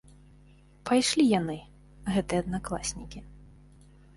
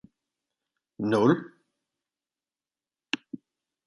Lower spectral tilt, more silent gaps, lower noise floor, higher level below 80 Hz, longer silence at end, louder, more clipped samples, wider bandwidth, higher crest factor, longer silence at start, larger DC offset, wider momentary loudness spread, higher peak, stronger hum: second, -4.5 dB/octave vs -6.5 dB/octave; neither; second, -56 dBFS vs under -90 dBFS; first, -50 dBFS vs -74 dBFS; first, 0.7 s vs 0.5 s; about the same, -28 LUFS vs -27 LUFS; neither; about the same, 11.5 kHz vs 11 kHz; second, 18 dB vs 24 dB; second, 0.85 s vs 1 s; neither; second, 19 LU vs 23 LU; second, -12 dBFS vs -8 dBFS; first, 50 Hz at -45 dBFS vs none